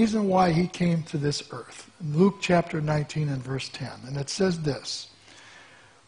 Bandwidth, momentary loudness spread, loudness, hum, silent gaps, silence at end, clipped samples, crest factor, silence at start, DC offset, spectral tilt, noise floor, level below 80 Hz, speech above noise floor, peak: 10.5 kHz; 15 LU; -26 LUFS; none; none; 0.45 s; under 0.1%; 18 dB; 0 s; under 0.1%; -6 dB/octave; -53 dBFS; -56 dBFS; 27 dB; -8 dBFS